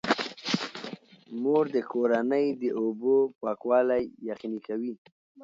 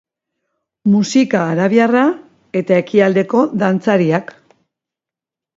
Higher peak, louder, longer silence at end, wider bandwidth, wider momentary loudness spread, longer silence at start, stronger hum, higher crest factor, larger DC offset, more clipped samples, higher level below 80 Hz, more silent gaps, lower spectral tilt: second, -10 dBFS vs 0 dBFS; second, -28 LUFS vs -15 LUFS; second, 0 s vs 1.35 s; about the same, 7.8 kHz vs 7.8 kHz; first, 13 LU vs 8 LU; second, 0.05 s vs 0.85 s; neither; about the same, 18 dB vs 16 dB; neither; neither; second, -70 dBFS vs -64 dBFS; first, 3.35-3.41 s, 4.98-5.05 s, 5.12-5.35 s vs none; second, -5 dB/octave vs -6.5 dB/octave